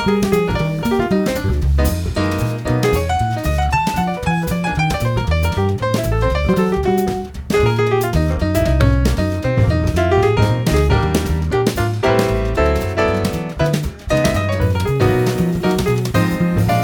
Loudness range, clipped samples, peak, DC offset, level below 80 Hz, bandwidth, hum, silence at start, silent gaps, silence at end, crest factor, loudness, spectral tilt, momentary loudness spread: 2 LU; under 0.1%; 0 dBFS; under 0.1%; -24 dBFS; 20 kHz; none; 0 s; none; 0 s; 16 dB; -17 LUFS; -6.5 dB/octave; 4 LU